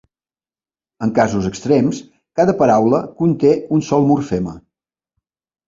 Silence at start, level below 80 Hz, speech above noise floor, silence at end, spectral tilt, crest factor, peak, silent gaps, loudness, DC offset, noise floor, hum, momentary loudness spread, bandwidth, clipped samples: 1 s; -48 dBFS; over 75 dB; 1.1 s; -7.5 dB/octave; 16 dB; -2 dBFS; none; -16 LUFS; under 0.1%; under -90 dBFS; none; 10 LU; 7.6 kHz; under 0.1%